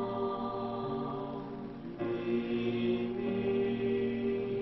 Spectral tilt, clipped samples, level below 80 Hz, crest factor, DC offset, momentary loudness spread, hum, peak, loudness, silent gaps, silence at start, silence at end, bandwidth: -9.5 dB/octave; under 0.1%; -60 dBFS; 12 dB; under 0.1%; 8 LU; none; -20 dBFS; -34 LUFS; none; 0 s; 0 s; 5.8 kHz